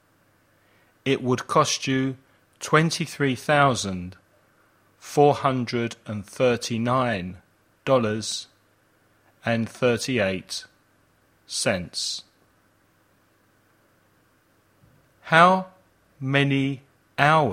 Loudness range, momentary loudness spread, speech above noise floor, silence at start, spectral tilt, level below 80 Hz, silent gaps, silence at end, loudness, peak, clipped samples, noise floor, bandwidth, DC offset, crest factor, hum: 9 LU; 16 LU; 40 dB; 1.05 s; -4.5 dB/octave; -62 dBFS; none; 0 s; -23 LUFS; 0 dBFS; under 0.1%; -63 dBFS; 16 kHz; under 0.1%; 24 dB; none